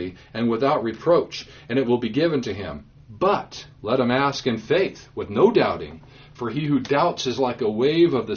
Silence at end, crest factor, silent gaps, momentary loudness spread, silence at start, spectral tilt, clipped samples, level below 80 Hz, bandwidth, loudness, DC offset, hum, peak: 0 s; 18 dB; none; 14 LU; 0 s; -4.5 dB/octave; under 0.1%; -54 dBFS; 6.8 kHz; -22 LUFS; under 0.1%; none; -4 dBFS